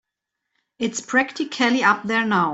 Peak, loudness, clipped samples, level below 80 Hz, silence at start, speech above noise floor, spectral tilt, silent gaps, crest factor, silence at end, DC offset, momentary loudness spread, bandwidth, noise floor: -4 dBFS; -20 LUFS; under 0.1%; -66 dBFS; 0.8 s; 61 dB; -3.5 dB/octave; none; 18 dB; 0 s; under 0.1%; 9 LU; 8.2 kHz; -81 dBFS